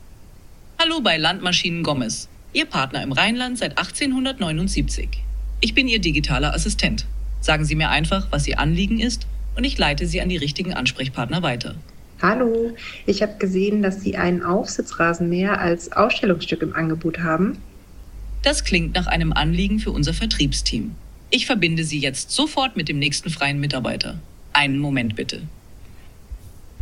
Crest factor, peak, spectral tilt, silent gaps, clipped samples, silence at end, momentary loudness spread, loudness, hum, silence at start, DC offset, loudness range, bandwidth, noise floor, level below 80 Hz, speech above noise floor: 22 dB; 0 dBFS; -4.5 dB/octave; none; under 0.1%; 0 s; 10 LU; -21 LUFS; none; 0 s; under 0.1%; 2 LU; 13 kHz; -42 dBFS; -30 dBFS; 22 dB